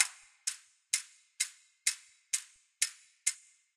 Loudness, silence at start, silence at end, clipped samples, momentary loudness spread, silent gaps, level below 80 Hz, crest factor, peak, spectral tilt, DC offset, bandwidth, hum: -35 LUFS; 0 s; 0.4 s; under 0.1%; 14 LU; none; under -90 dBFS; 30 dB; -8 dBFS; 9 dB/octave; under 0.1%; 16 kHz; none